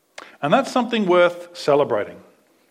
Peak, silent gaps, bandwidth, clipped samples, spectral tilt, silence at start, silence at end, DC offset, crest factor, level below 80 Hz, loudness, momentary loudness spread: -2 dBFS; none; 13.5 kHz; under 0.1%; -5.5 dB/octave; 0.2 s; 0.55 s; under 0.1%; 20 dB; -76 dBFS; -19 LUFS; 10 LU